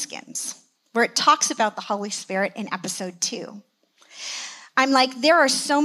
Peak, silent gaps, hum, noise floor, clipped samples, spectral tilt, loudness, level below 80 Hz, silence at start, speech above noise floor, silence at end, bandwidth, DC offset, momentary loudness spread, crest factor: -4 dBFS; none; none; -52 dBFS; under 0.1%; -1.5 dB/octave; -22 LUFS; -88 dBFS; 0 s; 30 dB; 0 s; 15.5 kHz; under 0.1%; 15 LU; 20 dB